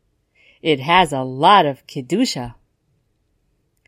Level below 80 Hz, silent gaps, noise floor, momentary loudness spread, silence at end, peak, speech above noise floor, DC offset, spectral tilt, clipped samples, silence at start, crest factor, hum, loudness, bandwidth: -52 dBFS; none; -66 dBFS; 15 LU; 1.35 s; 0 dBFS; 49 dB; under 0.1%; -4.5 dB/octave; under 0.1%; 0.65 s; 20 dB; none; -17 LUFS; 16 kHz